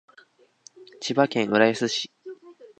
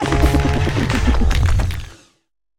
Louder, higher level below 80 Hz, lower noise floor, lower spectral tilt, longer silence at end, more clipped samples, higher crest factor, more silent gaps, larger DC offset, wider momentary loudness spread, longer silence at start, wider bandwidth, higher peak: second, -23 LUFS vs -18 LUFS; second, -72 dBFS vs -20 dBFS; second, -57 dBFS vs -65 dBFS; second, -4 dB/octave vs -6 dB/octave; second, 0.15 s vs 0.65 s; neither; first, 24 dB vs 16 dB; neither; neither; first, 23 LU vs 10 LU; first, 0.8 s vs 0 s; second, 9.2 kHz vs 16 kHz; about the same, -2 dBFS vs -2 dBFS